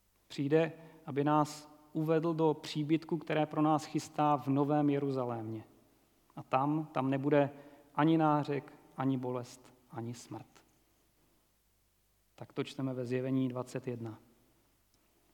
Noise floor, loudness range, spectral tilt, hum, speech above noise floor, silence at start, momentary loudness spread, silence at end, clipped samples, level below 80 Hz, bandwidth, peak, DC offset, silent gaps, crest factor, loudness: -73 dBFS; 10 LU; -7 dB/octave; none; 41 dB; 0.3 s; 17 LU; 1.15 s; under 0.1%; -78 dBFS; 17.5 kHz; -14 dBFS; under 0.1%; none; 20 dB; -33 LUFS